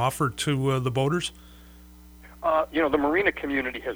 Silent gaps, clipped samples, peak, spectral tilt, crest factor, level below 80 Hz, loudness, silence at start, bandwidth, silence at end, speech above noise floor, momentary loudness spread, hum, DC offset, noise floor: none; under 0.1%; -8 dBFS; -5.5 dB/octave; 18 dB; -50 dBFS; -25 LUFS; 0 s; over 20 kHz; 0 s; 23 dB; 6 LU; 60 Hz at -50 dBFS; under 0.1%; -48 dBFS